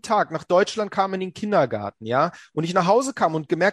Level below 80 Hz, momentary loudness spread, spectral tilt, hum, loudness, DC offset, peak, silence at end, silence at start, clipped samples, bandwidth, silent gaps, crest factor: -66 dBFS; 6 LU; -5.5 dB/octave; none; -22 LUFS; under 0.1%; -6 dBFS; 0 s; 0.05 s; under 0.1%; 12.5 kHz; none; 16 dB